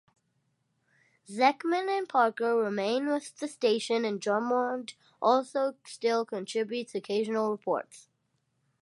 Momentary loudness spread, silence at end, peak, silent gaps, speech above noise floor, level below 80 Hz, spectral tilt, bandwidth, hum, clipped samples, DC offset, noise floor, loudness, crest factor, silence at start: 8 LU; 0.8 s; -10 dBFS; none; 47 dB; -86 dBFS; -4 dB/octave; 11.5 kHz; none; under 0.1%; under 0.1%; -76 dBFS; -29 LUFS; 20 dB; 1.3 s